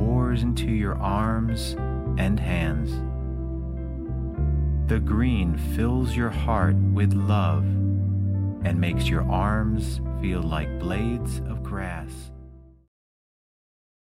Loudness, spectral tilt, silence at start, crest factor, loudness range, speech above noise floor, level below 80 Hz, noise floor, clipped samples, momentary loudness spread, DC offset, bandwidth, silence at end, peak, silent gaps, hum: -25 LUFS; -7.5 dB/octave; 0 s; 16 dB; 7 LU; 23 dB; -30 dBFS; -46 dBFS; under 0.1%; 9 LU; under 0.1%; 14.5 kHz; 1.45 s; -8 dBFS; none; none